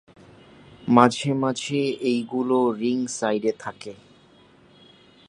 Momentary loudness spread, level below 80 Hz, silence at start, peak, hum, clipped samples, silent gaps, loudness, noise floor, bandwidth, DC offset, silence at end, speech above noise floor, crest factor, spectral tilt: 18 LU; -66 dBFS; 0.8 s; 0 dBFS; none; under 0.1%; none; -23 LUFS; -54 dBFS; 10.5 kHz; under 0.1%; 1.35 s; 32 dB; 24 dB; -5.5 dB/octave